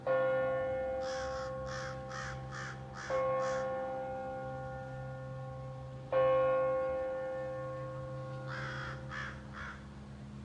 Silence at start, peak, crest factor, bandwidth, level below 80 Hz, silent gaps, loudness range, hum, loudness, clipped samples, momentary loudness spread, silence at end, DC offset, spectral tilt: 0 s; -20 dBFS; 16 dB; 9 kHz; -58 dBFS; none; 4 LU; none; -37 LUFS; under 0.1%; 14 LU; 0 s; under 0.1%; -6 dB/octave